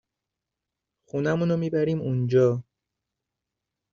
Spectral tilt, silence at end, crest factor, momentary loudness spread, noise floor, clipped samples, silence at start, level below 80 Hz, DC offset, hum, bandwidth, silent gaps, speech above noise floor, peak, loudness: -8 dB/octave; 1.3 s; 18 dB; 9 LU; -86 dBFS; under 0.1%; 1.15 s; -64 dBFS; under 0.1%; none; 7.2 kHz; none; 63 dB; -10 dBFS; -25 LUFS